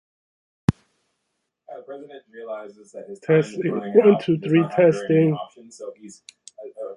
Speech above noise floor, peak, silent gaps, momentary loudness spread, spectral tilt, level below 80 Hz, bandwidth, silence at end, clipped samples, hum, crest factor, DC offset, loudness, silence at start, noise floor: 56 dB; -2 dBFS; none; 24 LU; -7.5 dB/octave; -52 dBFS; 11 kHz; 0 s; under 0.1%; none; 20 dB; under 0.1%; -20 LUFS; 0.7 s; -77 dBFS